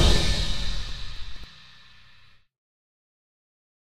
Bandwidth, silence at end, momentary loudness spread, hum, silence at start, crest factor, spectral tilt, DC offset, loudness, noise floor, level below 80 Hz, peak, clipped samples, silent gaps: 14 kHz; 1.3 s; 25 LU; none; 0 s; 20 dB; -4 dB/octave; under 0.1%; -28 LUFS; -56 dBFS; -32 dBFS; -8 dBFS; under 0.1%; none